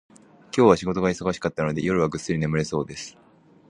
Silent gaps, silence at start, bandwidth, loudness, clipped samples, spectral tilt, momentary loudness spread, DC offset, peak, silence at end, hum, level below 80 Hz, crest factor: none; 0.55 s; 11 kHz; -23 LUFS; under 0.1%; -6 dB/octave; 12 LU; under 0.1%; -2 dBFS; 0.6 s; none; -50 dBFS; 22 dB